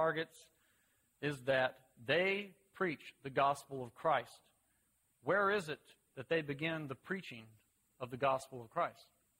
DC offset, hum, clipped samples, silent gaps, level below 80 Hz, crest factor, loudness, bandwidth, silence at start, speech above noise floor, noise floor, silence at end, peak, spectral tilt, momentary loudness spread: under 0.1%; none; under 0.1%; none; -76 dBFS; 20 dB; -38 LUFS; 16 kHz; 0 s; 40 dB; -78 dBFS; 0.4 s; -18 dBFS; -5 dB/octave; 16 LU